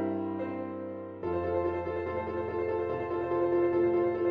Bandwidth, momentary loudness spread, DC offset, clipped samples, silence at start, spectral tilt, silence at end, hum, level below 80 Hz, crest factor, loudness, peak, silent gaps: 5 kHz; 10 LU; under 0.1%; under 0.1%; 0 s; -10 dB/octave; 0 s; none; -58 dBFS; 14 dB; -31 LUFS; -18 dBFS; none